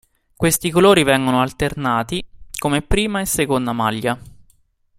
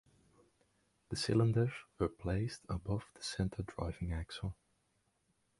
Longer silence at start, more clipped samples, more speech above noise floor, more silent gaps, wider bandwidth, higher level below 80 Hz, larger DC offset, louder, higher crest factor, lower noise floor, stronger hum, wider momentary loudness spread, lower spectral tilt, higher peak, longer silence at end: second, 0.4 s vs 1.1 s; neither; about the same, 40 dB vs 42 dB; neither; first, 16 kHz vs 11.5 kHz; first, -36 dBFS vs -52 dBFS; neither; first, -18 LUFS vs -38 LUFS; about the same, 18 dB vs 20 dB; second, -57 dBFS vs -79 dBFS; neither; about the same, 12 LU vs 12 LU; second, -4.5 dB/octave vs -6 dB/octave; first, 0 dBFS vs -20 dBFS; second, 0.7 s vs 1.05 s